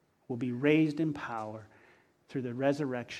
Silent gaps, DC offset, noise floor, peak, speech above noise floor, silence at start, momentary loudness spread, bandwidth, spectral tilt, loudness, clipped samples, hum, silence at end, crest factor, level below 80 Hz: none; under 0.1%; -64 dBFS; -12 dBFS; 32 dB; 0.3 s; 15 LU; 9.6 kHz; -7 dB/octave; -32 LUFS; under 0.1%; none; 0 s; 20 dB; -72 dBFS